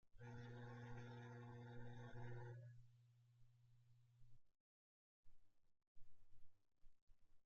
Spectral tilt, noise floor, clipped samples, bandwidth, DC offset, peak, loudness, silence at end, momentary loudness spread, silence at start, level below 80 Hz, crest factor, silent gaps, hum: -6.5 dB/octave; under -90 dBFS; under 0.1%; 7 kHz; under 0.1%; -44 dBFS; -59 LUFS; 0 s; 5 LU; 0.05 s; -74 dBFS; 14 dB; 4.60-5.23 s, 5.87-5.95 s, 7.02-7.07 s; none